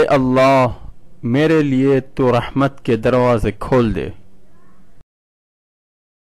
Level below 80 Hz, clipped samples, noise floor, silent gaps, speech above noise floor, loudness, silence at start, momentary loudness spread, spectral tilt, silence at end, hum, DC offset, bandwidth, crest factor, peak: -36 dBFS; under 0.1%; -50 dBFS; none; 35 dB; -16 LUFS; 0 s; 8 LU; -7.5 dB/octave; 2.1 s; none; 1%; 13 kHz; 10 dB; -6 dBFS